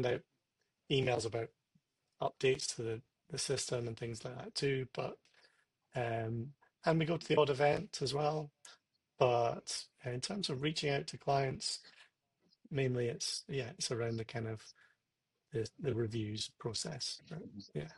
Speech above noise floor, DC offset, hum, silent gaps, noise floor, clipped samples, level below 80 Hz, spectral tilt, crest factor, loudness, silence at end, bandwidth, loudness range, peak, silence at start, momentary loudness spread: 50 dB; under 0.1%; none; none; -87 dBFS; under 0.1%; -70 dBFS; -4.5 dB/octave; 22 dB; -37 LUFS; 0 s; 12 kHz; 6 LU; -16 dBFS; 0 s; 12 LU